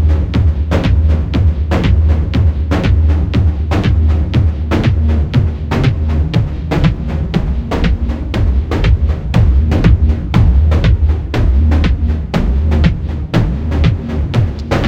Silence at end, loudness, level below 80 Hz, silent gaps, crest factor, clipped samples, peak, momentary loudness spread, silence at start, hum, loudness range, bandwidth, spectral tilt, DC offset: 0 s; -14 LUFS; -14 dBFS; none; 12 dB; under 0.1%; 0 dBFS; 5 LU; 0 s; none; 3 LU; 7 kHz; -8 dB/octave; under 0.1%